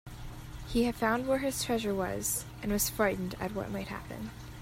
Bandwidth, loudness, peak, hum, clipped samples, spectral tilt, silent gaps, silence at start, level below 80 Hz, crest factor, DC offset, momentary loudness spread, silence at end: 16 kHz; -32 LUFS; -14 dBFS; none; under 0.1%; -4 dB/octave; none; 0.05 s; -48 dBFS; 20 dB; under 0.1%; 14 LU; 0 s